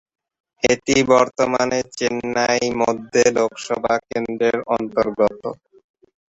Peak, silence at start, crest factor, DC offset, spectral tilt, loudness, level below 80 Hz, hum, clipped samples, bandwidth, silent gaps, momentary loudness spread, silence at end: -2 dBFS; 0.65 s; 18 dB; under 0.1%; -3.5 dB/octave; -19 LUFS; -52 dBFS; none; under 0.1%; 8 kHz; none; 7 LU; 0.75 s